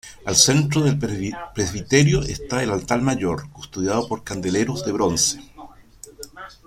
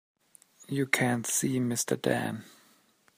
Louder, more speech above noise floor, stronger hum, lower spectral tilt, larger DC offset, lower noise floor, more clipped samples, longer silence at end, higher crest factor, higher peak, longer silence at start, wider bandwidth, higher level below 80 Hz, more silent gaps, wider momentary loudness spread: first, -20 LUFS vs -29 LUFS; second, 24 dB vs 36 dB; neither; about the same, -4 dB/octave vs -4 dB/octave; neither; second, -45 dBFS vs -65 dBFS; neither; second, 0.15 s vs 0.7 s; about the same, 22 dB vs 24 dB; first, 0 dBFS vs -8 dBFS; second, 0.05 s vs 0.7 s; about the same, 15.5 kHz vs 15.5 kHz; first, -42 dBFS vs -74 dBFS; neither; first, 16 LU vs 10 LU